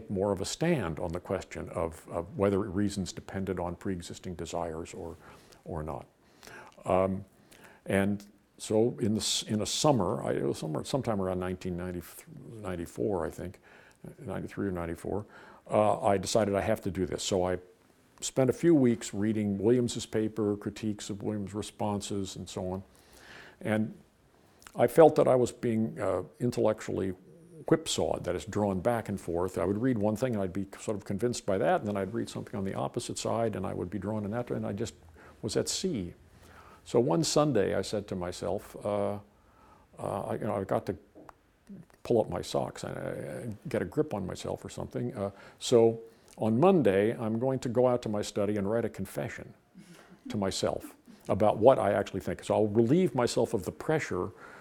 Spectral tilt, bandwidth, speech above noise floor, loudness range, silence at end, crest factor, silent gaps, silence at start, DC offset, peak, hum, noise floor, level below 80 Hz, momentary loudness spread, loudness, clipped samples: -5.5 dB/octave; 19 kHz; 33 dB; 8 LU; 0 s; 24 dB; none; 0 s; under 0.1%; -6 dBFS; none; -63 dBFS; -58 dBFS; 14 LU; -30 LUFS; under 0.1%